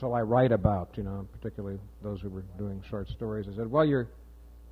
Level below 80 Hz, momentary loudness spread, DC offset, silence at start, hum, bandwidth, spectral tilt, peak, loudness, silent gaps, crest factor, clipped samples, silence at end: -46 dBFS; 15 LU; under 0.1%; 0 s; none; 5.6 kHz; -9.5 dB/octave; -10 dBFS; -31 LUFS; none; 20 dB; under 0.1%; 0 s